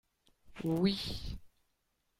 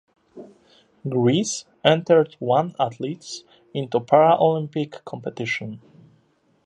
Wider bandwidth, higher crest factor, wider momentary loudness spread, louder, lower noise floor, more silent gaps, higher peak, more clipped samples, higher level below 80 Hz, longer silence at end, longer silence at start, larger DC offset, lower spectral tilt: first, 16 kHz vs 10.5 kHz; about the same, 20 dB vs 22 dB; about the same, 16 LU vs 17 LU; second, -35 LUFS vs -21 LUFS; first, -80 dBFS vs -63 dBFS; neither; second, -20 dBFS vs -2 dBFS; neither; first, -52 dBFS vs -68 dBFS; second, 0.7 s vs 0.9 s; about the same, 0.45 s vs 0.35 s; neither; first, -6.5 dB/octave vs -5 dB/octave